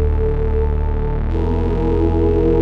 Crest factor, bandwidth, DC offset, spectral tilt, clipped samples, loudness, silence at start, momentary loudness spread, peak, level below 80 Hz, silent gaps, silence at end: 12 dB; 4.7 kHz; under 0.1%; -10.5 dB/octave; under 0.1%; -19 LUFS; 0 s; 5 LU; -4 dBFS; -18 dBFS; none; 0 s